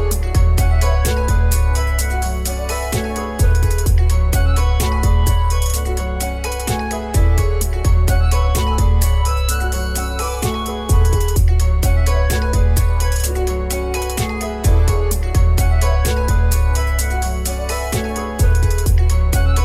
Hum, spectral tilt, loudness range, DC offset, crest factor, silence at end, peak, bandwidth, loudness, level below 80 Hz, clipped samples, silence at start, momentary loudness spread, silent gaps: none; -5 dB/octave; 1 LU; under 0.1%; 10 dB; 0 s; -4 dBFS; 16 kHz; -17 LUFS; -16 dBFS; under 0.1%; 0 s; 6 LU; none